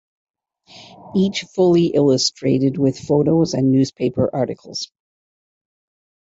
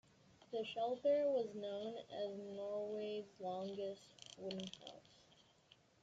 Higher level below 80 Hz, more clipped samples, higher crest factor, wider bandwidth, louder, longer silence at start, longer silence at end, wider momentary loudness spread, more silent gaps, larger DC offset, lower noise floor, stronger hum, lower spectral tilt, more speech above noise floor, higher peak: first, -54 dBFS vs -86 dBFS; neither; about the same, 14 dB vs 18 dB; about the same, 8 kHz vs 7.8 kHz; first, -18 LUFS vs -43 LUFS; first, 0.75 s vs 0.4 s; first, 1.55 s vs 0.9 s; second, 9 LU vs 16 LU; neither; neither; second, -46 dBFS vs -71 dBFS; neither; about the same, -6 dB/octave vs -5 dB/octave; about the same, 29 dB vs 28 dB; first, -4 dBFS vs -28 dBFS